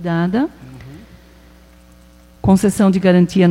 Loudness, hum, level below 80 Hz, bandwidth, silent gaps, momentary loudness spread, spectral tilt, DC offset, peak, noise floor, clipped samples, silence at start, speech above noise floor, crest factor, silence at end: -15 LUFS; none; -42 dBFS; 14 kHz; none; 24 LU; -7 dB/octave; under 0.1%; 0 dBFS; -45 dBFS; under 0.1%; 0 s; 32 dB; 16 dB; 0 s